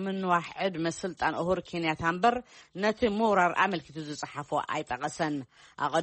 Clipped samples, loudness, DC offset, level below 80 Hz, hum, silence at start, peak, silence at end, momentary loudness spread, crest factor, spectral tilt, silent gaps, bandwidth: under 0.1%; -29 LUFS; under 0.1%; -60 dBFS; none; 0 s; -12 dBFS; 0 s; 12 LU; 18 dB; -5 dB/octave; none; 8.4 kHz